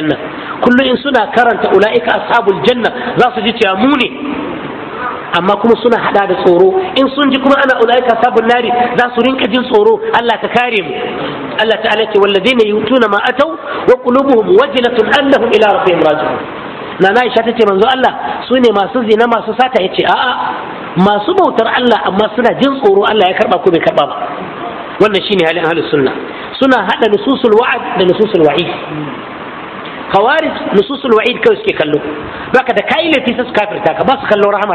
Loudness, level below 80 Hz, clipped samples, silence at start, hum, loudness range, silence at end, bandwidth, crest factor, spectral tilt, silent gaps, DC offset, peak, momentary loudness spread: -11 LUFS; -48 dBFS; 0.7%; 0 s; none; 3 LU; 0 s; 11 kHz; 10 dB; -6 dB/octave; none; under 0.1%; 0 dBFS; 10 LU